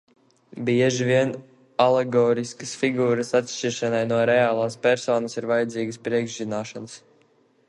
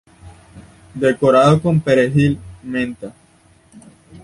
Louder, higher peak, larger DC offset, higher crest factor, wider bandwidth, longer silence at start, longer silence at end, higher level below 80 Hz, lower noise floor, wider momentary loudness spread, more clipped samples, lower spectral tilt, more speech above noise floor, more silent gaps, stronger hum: second, -23 LUFS vs -16 LUFS; about the same, -4 dBFS vs -2 dBFS; neither; about the same, 20 dB vs 16 dB; about the same, 11.5 kHz vs 11.5 kHz; first, 0.55 s vs 0.25 s; first, 0.7 s vs 0.05 s; second, -68 dBFS vs -46 dBFS; first, -61 dBFS vs -52 dBFS; second, 11 LU vs 19 LU; neither; second, -5 dB/octave vs -7 dB/octave; about the same, 39 dB vs 37 dB; neither; neither